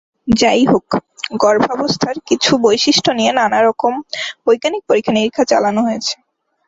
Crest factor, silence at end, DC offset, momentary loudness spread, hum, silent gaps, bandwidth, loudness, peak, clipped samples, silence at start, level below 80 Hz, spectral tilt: 14 dB; 0.55 s; under 0.1%; 9 LU; none; none; 8 kHz; -15 LUFS; 0 dBFS; under 0.1%; 0.25 s; -48 dBFS; -4 dB/octave